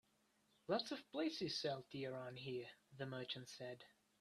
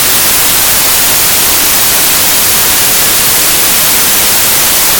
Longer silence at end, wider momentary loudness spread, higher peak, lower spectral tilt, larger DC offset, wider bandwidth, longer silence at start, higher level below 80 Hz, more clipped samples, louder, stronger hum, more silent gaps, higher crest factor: first, 0.3 s vs 0 s; first, 13 LU vs 0 LU; second, -28 dBFS vs 0 dBFS; first, -5 dB/octave vs 0 dB/octave; neither; second, 13.5 kHz vs over 20 kHz; first, 0.7 s vs 0 s; second, -86 dBFS vs -32 dBFS; second, under 0.1% vs 1%; second, -47 LUFS vs -4 LUFS; neither; neither; first, 20 dB vs 8 dB